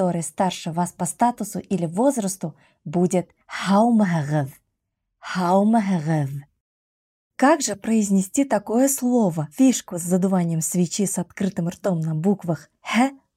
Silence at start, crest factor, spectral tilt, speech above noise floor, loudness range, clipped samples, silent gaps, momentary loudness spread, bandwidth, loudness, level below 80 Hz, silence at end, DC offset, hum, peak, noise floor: 0 s; 16 dB; -5.5 dB/octave; 57 dB; 3 LU; under 0.1%; 6.60-7.31 s; 11 LU; 16 kHz; -22 LUFS; -64 dBFS; 0.2 s; under 0.1%; none; -6 dBFS; -78 dBFS